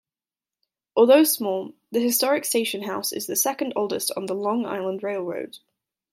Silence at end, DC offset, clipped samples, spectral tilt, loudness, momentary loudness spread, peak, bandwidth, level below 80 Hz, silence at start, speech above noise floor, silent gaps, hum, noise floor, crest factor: 0.55 s; under 0.1%; under 0.1%; -2.5 dB/octave; -23 LUFS; 12 LU; -4 dBFS; 16.5 kHz; -78 dBFS; 0.95 s; over 67 dB; none; none; under -90 dBFS; 20 dB